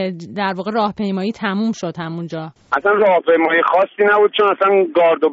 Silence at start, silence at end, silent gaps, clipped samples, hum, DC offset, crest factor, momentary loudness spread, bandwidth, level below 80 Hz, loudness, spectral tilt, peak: 0 s; 0 s; none; under 0.1%; none; under 0.1%; 14 dB; 12 LU; 7.6 kHz; -62 dBFS; -16 LUFS; -3.5 dB/octave; -2 dBFS